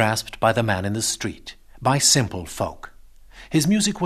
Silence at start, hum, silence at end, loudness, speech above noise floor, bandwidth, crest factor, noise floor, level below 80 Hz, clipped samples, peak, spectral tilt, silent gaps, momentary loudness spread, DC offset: 0 s; none; 0 s; -21 LUFS; 24 dB; 14 kHz; 20 dB; -45 dBFS; -46 dBFS; under 0.1%; -4 dBFS; -3.5 dB/octave; none; 14 LU; under 0.1%